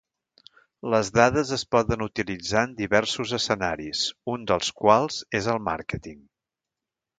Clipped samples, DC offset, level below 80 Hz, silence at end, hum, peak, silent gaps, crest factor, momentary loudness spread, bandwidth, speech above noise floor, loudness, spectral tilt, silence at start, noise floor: under 0.1%; under 0.1%; -50 dBFS; 1 s; none; -2 dBFS; none; 24 dB; 10 LU; 9.4 kHz; 64 dB; -24 LUFS; -4 dB/octave; 0.85 s; -88 dBFS